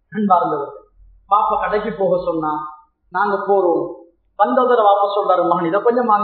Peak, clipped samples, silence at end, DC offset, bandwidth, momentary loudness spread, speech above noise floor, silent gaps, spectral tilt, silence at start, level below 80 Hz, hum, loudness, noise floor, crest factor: 0 dBFS; under 0.1%; 0 s; under 0.1%; 4.5 kHz; 11 LU; 32 dB; none; -10 dB/octave; 0.1 s; -54 dBFS; none; -17 LUFS; -48 dBFS; 16 dB